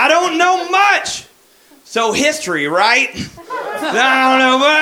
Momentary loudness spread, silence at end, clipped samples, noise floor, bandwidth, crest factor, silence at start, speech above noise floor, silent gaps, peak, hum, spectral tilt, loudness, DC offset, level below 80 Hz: 13 LU; 0 s; under 0.1%; -48 dBFS; 17 kHz; 14 dB; 0 s; 35 dB; none; 0 dBFS; none; -2 dB/octave; -13 LUFS; under 0.1%; -54 dBFS